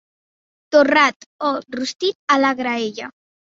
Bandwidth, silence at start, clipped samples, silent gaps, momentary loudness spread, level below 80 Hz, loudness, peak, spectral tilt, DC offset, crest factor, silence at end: 7.8 kHz; 0.7 s; under 0.1%; 1.16-1.20 s, 1.26-1.39 s, 1.95-1.99 s, 2.15-2.27 s; 12 LU; -66 dBFS; -18 LUFS; -2 dBFS; -3 dB/octave; under 0.1%; 18 dB; 0.4 s